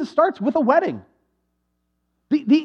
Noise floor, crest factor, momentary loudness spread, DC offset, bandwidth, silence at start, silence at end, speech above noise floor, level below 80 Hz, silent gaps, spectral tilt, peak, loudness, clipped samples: -72 dBFS; 18 dB; 10 LU; under 0.1%; 6.6 kHz; 0 s; 0 s; 54 dB; -70 dBFS; none; -7 dB/octave; -2 dBFS; -20 LUFS; under 0.1%